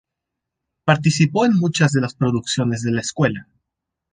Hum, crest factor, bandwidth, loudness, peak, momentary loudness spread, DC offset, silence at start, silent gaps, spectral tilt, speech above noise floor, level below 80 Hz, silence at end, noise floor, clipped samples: none; 18 dB; 9.8 kHz; -19 LUFS; -2 dBFS; 6 LU; under 0.1%; 0.85 s; none; -5.5 dB/octave; 64 dB; -54 dBFS; 0.7 s; -82 dBFS; under 0.1%